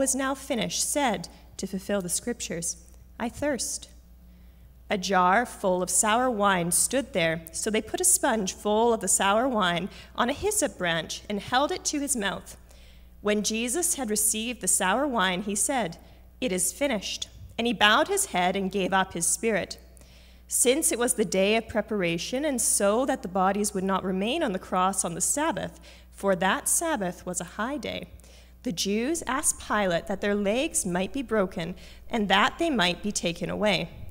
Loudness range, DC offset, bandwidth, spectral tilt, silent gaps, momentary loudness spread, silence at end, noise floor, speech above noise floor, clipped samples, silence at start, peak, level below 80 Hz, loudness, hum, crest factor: 5 LU; under 0.1%; 16 kHz; -2.5 dB/octave; none; 11 LU; 0 s; -51 dBFS; 24 dB; under 0.1%; 0 s; -4 dBFS; -50 dBFS; -26 LUFS; none; 22 dB